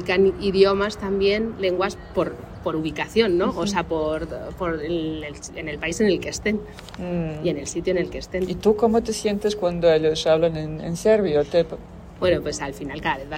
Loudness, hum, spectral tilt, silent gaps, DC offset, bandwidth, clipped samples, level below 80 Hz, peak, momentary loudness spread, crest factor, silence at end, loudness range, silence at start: -23 LUFS; none; -5 dB/octave; none; under 0.1%; 16 kHz; under 0.1%; -42 dBFS; -4 dBFS; 11 LU; 18 dB; 0 s; 5 LU; 0 s